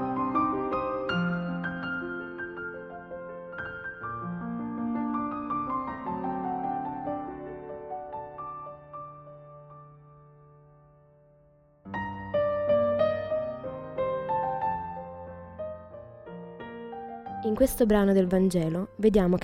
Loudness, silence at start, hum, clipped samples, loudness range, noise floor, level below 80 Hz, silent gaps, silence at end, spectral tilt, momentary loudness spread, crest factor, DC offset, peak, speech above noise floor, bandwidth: -30 LUFS; 0 s; none; under 0.1%; 15 LU; -60 dBFS; -52 dBFS; none; 0 s; -7 dB/octave; 19 LU; 20 dB; under 0.1%; -10 dBFS; 37 dB; 16 kHz